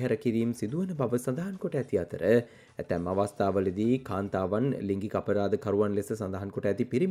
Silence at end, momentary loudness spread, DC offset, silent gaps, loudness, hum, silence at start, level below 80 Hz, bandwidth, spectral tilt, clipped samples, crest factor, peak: 0 s; 6 LU; under 0.1%; none; -30 LUFS; none; 0 s; -64 dBFS; 15.5 kHz; -7.5 dB/octave; under 0.1%; 18 dB; -10 dBFS